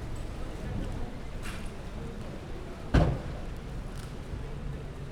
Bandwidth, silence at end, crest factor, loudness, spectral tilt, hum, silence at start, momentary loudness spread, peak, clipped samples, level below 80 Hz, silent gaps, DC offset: 14 kHz; 0 s; 24 dB; -36 LUFS; -7 dB/octave; none; 0 s; 13 LU; -10 dBFS; under 0.1%; -36 dBFS; none; under 0.1%